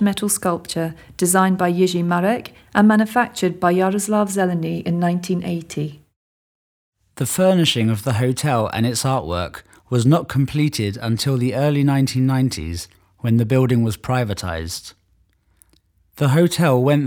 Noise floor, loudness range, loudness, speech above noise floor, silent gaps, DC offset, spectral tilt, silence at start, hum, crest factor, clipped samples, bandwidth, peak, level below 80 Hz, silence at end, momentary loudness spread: -61 dBFS; 4 LU; -19 LUFS; 42 dB; 6.16-6.92 s; under 0.1%; -5.5 dB/octave; 0 s; none; 18 dB; under 0.1%; over 20 kHz; 0 dBFS; -46 dBFS; 0 s; 10 LU